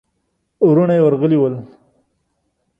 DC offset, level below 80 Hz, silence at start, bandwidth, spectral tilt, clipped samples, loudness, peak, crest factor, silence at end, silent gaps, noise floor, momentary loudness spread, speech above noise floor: under 0.1%; -60 dBFS; 0.6 s; 3.7 kHz; -11 dB/octave; under 0.1%; -14 LUFS; -2 dBFS; 14 dB; 1.15 s; none; -69 dBFS; 7 LU; 56 dB